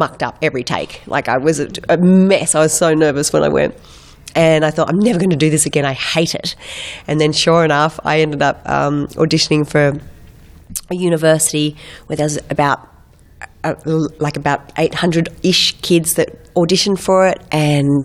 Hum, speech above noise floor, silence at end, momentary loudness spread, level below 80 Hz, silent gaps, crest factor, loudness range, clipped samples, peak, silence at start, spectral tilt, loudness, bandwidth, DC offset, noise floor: none; 30 dB; 0 s; 9 LU; -44 dBFS; none; 16 dB; 4 LU; under 0.1%; 0 dBFS; 0 s; -4.5 dB/octave; -15 LUFS; 15.5 kHz; under 0.1%; -45 dBFS